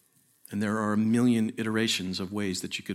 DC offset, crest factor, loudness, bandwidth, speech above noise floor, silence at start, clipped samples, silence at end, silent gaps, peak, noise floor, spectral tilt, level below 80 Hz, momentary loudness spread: under 0.1%; 14 dB; -28 LUFS; 15 kHz; 31 dB; 0.5 s; under 0.1%; 0 s; none; -14 dBFS; -58 dBFS; -4.5 dB/octave; -70 dBFS; 9 LU